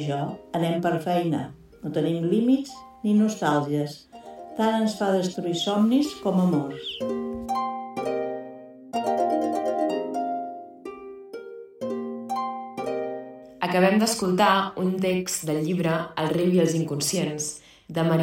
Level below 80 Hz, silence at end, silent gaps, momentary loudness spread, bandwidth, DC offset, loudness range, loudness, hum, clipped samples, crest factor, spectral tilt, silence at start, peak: -62 dBFS; 0 s; none; 17 LU; 16.5 kHz; under 0.1%; 6 LU; -25 LUFS; none; under 0.1%; 18 dB; -5.5 dB/octave; 0 s; -8 dBFS